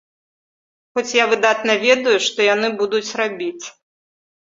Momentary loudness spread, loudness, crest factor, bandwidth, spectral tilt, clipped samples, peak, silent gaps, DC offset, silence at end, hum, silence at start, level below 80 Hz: 12 LU; -17 LUFS; 18 dB; 7.8 kHz; -2 dB/octave; under 0.1%; -2 dBFS; none; under 0.1%; 0.8 s; none; 0.95 s; -68 dBFS